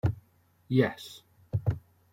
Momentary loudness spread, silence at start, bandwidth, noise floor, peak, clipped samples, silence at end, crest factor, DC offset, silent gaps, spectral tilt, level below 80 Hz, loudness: 18 LU; 0.05 s; 16.5 kHz; -65 dBFS; -10 dBFS; under 0.1%; 0.35 s; 22 dB; under 0.1%; none; -7.5 dB/octave; -52 dBFS; -31 LUFS